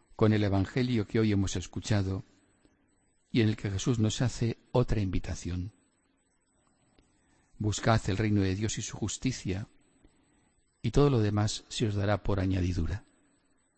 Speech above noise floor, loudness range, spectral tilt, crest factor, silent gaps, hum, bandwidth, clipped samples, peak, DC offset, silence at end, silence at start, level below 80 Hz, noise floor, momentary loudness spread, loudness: 43 dB; 4 LU; -6 dB/octave; 20 dB; none; none; 8.8 kHz; under 0.1%; -12 dBFS; under 0.1%; 0.75 s; 0.1 s; -44 dBFS; -72 dBFS; 10 LU; -30 LUFS